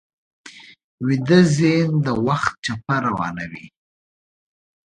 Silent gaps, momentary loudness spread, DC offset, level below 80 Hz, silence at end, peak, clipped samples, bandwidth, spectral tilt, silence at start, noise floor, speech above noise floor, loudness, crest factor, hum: 0.84-0.98 s; 13 LU; under 0.1%; -54 dBFS; 1.2 s; 0 dBFS; under 0.1%; 10.5 kHz; -6.5 dB/octave; 0.45 s; under -90 dBFS; over 71 dB; -19 LUFS; 20 dB; none